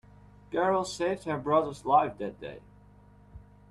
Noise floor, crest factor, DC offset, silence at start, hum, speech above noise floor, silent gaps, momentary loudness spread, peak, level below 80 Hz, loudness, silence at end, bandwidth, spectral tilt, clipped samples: -56 dBFS; 20 dB; under 0.1%; 0.5 s; 50 Hz at -50 dBFS; 27 dB; none; 17 LU; -10 dBFS; -58 dBFS; -29 LUFS; 0.3 s; 12 kHz; -5.5 dB/octave; under 0.1%